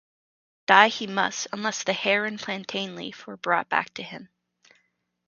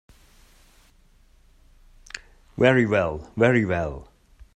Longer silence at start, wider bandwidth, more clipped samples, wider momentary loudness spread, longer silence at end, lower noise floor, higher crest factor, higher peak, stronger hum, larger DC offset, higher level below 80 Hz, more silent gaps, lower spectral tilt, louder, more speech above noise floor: second, 0.7 s vs 2.55 s; second, 7.4 kHz vs 10 kHz; neither; about the same, 20 LU vs 21 LU; first, 1.05 s vs 0.5 s; first, -73 dBFS vs -56 dBFS; about the same, 26 dB vs 22 dB; first, 0 dBFS vs -4 dBFS; neither; neither; second, -76 dBFS vs -48 dBFS; neither; second, -2.5 dB/octave vs -7 dB/octave; about the same, -24 LUFS vs -22 LUFS; first, 47 dB vs 35 dB